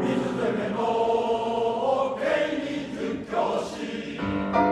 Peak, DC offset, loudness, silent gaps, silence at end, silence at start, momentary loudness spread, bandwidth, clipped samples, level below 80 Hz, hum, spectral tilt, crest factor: -10 dBFS; under 0.1%; -26 LUFS; none; 0 s; 0 s; 7 LU; 11.5 kHz; under 0.1%; -54 dBFS; none; -6 dB/octave; 16 dB